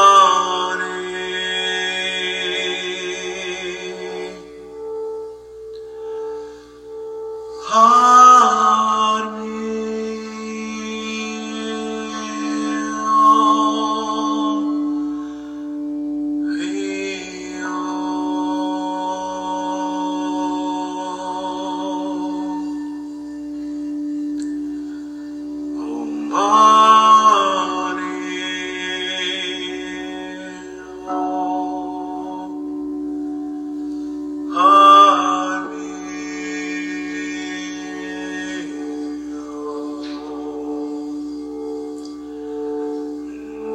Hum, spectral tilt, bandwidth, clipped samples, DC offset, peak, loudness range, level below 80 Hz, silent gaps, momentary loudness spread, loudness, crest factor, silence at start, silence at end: 60 Hz at -55 dBFS; -2.5 dB/octave; 10.5 kHz; under 0.1%; under 0.1%; 0 dBFS; 14 LU; -58 dBFS; none; 19 LU; -19 LUFS; 20 dB; 0 s; 0 s